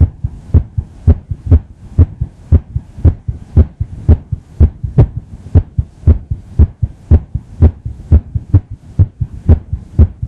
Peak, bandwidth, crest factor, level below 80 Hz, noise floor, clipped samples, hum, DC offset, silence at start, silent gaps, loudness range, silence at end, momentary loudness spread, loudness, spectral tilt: 0 dBFS; 2.4 kHz; 12 dB; -16 dBFS; -27 dBFS; 0.7%; none; 0.3%; 0 s; none; 1 LU; 0 s; 10 LU; -14 LUFS; -11.5 dB/octave